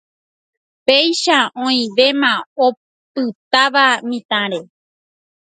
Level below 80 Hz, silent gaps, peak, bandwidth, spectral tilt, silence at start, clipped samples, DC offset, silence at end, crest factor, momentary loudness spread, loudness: -70 dBFS; 2.46-2.56 s, 2.77-3.15 s, 3.35-3.51 s, 4.25-4.29 s; 0 dBFS; 9.4 kHz; -2.5 dB/octave; 0.9 s; under 0.1%; under 0.1%; 0.85 s; 18 dB; 10 LU; -15 LUFS